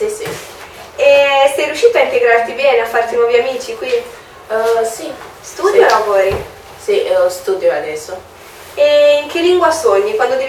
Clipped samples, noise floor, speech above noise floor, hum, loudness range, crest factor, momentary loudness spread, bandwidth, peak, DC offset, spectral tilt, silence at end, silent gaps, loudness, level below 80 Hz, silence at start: under 0.1%; -33 dBFS; 20 dB; none; 3 LU; 14 dB; 18 LU; 17 kHz; 0 dBFS; under 0.1%; -3 dB/octave; 0 s; none; -13 LUFS; -48 dBFS; 0 s